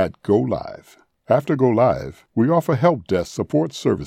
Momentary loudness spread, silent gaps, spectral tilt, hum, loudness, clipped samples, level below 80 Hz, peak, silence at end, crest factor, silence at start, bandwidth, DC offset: 10 LU; none; -7.5 dB/octave; none; -20 LUFS; under 0.1%; -52 dBFS; -4 dBFS; 0 s; 16 dB; 0 s; 15.5 kHz; under 0.1%